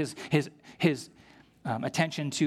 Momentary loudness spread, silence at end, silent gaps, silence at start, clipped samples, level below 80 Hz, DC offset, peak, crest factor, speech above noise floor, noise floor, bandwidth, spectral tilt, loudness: 13 LU; 0 s; none; 0 s; under 0.1%; -70 dBFS; under 0.1%; -10 dBFS; 20 dB; 22 dB; -51 dBFS; 15 kHz; -5.5 dB/octave; -30 LUFS